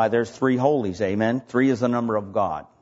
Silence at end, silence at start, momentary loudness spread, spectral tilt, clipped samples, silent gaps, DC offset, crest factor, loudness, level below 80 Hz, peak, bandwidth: 0.2 s; 0 s; 5 LU; -7 dB/octave; under 0.1%; none; under 0.1%; 16 dB; -23 LUFS; -60 dBFS; -6 dBFS; 8 kHz